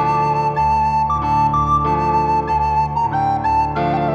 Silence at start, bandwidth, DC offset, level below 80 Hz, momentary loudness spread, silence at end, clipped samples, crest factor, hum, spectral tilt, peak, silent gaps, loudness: 0 s; 8.4 kHz; under 0.1%; -32 dBFS; 2 LU; 0 s; under 0.1%; 10 dB; none; -7.5 dB/octave; -6 dBFS; none; -17 LUFS